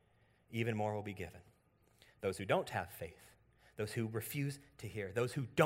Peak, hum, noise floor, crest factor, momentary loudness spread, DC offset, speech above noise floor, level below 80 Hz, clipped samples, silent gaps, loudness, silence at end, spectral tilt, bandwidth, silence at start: -14 dBFS; none; -72 dBFS; 26 dB; 13 LU; under 0.1%; 33 dB; -70 dBFS; under 0.1%; none; -41 LUFS; 0 s; -6 dB/octave; 16 kHz; 0.5 s